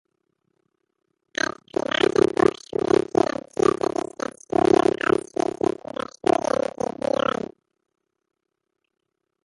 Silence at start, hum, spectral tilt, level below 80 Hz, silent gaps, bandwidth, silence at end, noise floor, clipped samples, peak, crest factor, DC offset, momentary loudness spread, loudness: 2.15 s; none; -5 dB/octave; -56 dBFS; none; 11.5 kHz; 4.7 s; -79 dBFS; under 0.1%; -4 dBFS; 20 dB; under 0.1%; 11 LU; -23 LUFS